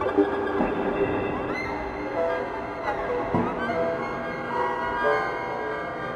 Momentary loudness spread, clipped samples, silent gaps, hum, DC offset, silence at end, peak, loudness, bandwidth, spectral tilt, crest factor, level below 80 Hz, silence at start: 6 LU; under 0.1%; none; none; under 0.1%; 0 s; -8 dBFS; -27 LUFS; 11 kHz; -7 dB/octave; 18 dB; -48 dBFS; 0 s